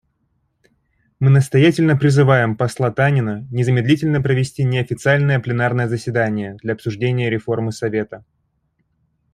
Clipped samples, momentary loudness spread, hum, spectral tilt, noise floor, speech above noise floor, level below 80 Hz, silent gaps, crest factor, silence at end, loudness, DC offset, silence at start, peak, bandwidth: under 0.1%; 9 LU; none; -7 dB/octave; -67 dBFS; 50 dB; -52 dBFS; none; 16 dB; 1.15 s; -17 LUFS; under 0.1%; 1.2 s; -2 dBFS; 11.5 kHz